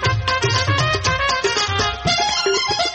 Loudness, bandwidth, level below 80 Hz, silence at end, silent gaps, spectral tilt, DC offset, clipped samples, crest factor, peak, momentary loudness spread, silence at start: -18 LUFS; 8.8 kHz; -36 dBFS; 0 s; none; -3 dB/octave; under 0.1%; under 0.1%; 14 dB; -6 dBFS; 2 LU; 0 s